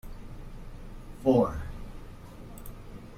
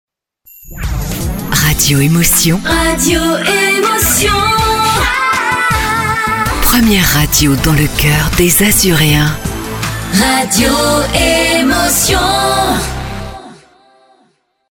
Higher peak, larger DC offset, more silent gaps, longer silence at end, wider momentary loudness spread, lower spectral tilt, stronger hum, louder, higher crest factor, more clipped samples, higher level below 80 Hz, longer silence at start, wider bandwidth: second, -10 dBFS vs 0 dBFS; neither; neither; second, 0 s vs 1.2 s; first, 23 LU vs 10 LU; first, -8 dB/octave vs -3.5 dB/octave; neither; second, -27 LUFS vs -11 LUFS; first, 22 dB vs 12 dB; neither; second, -44 dBFS vs -24 dBFS; second, 0.05 s vs 0.65 s; second, 16 kHz vs 18 kHz